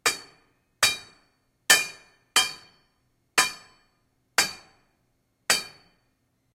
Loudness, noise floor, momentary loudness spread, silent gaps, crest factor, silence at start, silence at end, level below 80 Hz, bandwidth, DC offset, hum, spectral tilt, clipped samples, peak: -24 LUFS; -71 dBFS; 21 LU; none; 26 dB; 0.05 s; 0.85 s; -68 dBFS; 16 kHz; under 0.1%; none; 1.5 dB/octave; under 0.1%; -4 dBFS